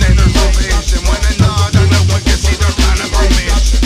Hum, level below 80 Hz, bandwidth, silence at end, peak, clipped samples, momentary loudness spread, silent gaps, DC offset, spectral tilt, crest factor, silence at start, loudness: none; -12 dBFS; 15 kHz; 0 s; 0 dBFS; under 0.1%; 4 LU; none; under 0.1%; -4.5 dB/octave; 10 dB; 0 s; -12 LUFS